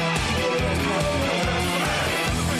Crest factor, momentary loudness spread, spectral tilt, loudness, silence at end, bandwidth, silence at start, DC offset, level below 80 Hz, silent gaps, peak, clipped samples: 12 dB; 0 LU; -4 dB/octave; -23 LUFS; 0 s; 16 kHz; 0 s; under 0.1%; -36 dBFS; none; -12 dBFS; under 0.1%